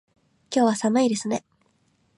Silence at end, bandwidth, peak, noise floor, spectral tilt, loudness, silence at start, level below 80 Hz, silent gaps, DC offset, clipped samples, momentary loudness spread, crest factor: 0.8 s; 11.5 kHz; -10 dBFS; -66 dBFS; -4.5 dB/octave; -23 LUFS; 0.5 s; -74 dBFS; none; under 0.1%; under 0.1%; 9 LU; 16 dB